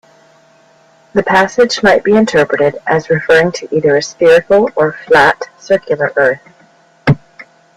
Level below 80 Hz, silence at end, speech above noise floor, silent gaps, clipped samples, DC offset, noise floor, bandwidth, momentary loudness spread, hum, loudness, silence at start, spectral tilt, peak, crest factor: -46 dBFS; 0.35 s; 37 dB; none; under 0.1%; under 0.1%; -47 dBFS; 11.5 kHz; 7 LU; none; -12 LUFS; 1.15 s; -5.5 dB/octave; 0 dBFS; 12 dB